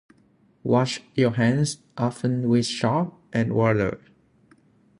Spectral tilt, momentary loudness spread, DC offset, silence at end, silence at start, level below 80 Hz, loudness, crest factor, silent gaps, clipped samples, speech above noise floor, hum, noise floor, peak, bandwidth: -6 dB/octave; 7 LU; under 0.1%; 1.05 s; 0.65 s; -56 dBFS; -24 LUFS; 18 dB; none; under 0.1%; 38 dB; none; -60 dBFS; -6 dBFS; 11 kHz